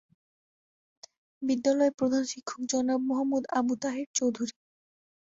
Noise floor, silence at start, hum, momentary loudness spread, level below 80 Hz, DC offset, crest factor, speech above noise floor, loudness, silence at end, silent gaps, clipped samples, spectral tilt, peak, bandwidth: under -90 dBFS; 1.4 s; none; 10 LU; -72 dBFS; under 0.1%; 18 dB; over 62 dB; -29 LUFS; 0.9 s; 1.94-1.98 s, 4.06-4.14 s; under 0.1%; -3.5 dB/octave; -14 dBFS; 8 kHz